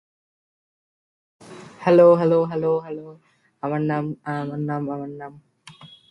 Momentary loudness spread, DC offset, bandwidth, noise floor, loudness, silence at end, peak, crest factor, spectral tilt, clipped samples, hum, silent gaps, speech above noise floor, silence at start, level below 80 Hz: 21 LU; under 0.1%; 6.2 kHz; -47 dBFS; -21 LUFS; 0.25 s; -4 dBFS; 20 dB; -8.5 dB/octave; under 0.1%; none; none; 26 dB; 1.45 s; -66 dBFS